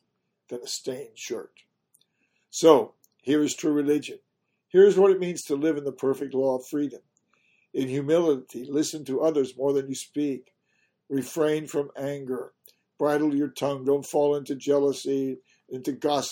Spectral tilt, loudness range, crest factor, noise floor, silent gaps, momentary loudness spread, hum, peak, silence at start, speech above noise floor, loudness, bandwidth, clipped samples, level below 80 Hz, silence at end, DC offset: -5 dB/octave; 6 LU; 22 dB; -73 dBFS; none; 15 LU; none; -4 dBFS; 0.5 s; 48 dB; -25 LUFS; 17 kHz; under 0.1%; -76 dBFS; 0 s; under 0.1%